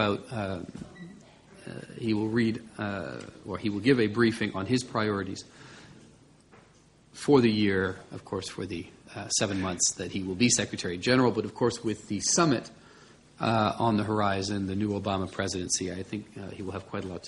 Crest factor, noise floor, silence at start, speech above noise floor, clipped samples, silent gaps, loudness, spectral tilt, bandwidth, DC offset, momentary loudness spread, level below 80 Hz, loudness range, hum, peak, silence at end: 22 dB; -59 dBFS; 0 s; 31 dB; under 0.1%; none; -28 LUFS; -4 dB/octave; 11.5 kHz; under 0.1%; 18 LU; -60 dBFS; 4 LU; none; -8 dBFS; 0 s